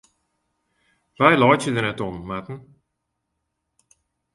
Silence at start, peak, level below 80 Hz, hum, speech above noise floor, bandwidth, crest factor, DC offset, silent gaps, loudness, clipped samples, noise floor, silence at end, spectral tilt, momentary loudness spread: 1.2 s; 0 dBFS; -56 dBFS; none; 58 dB; 11.5 kHz; 24 dB; under 0.1%; none; -20 LUFS; under 0.1%; -78 dBFS; 1.75 s; -5.5 dB/octave; 19 LU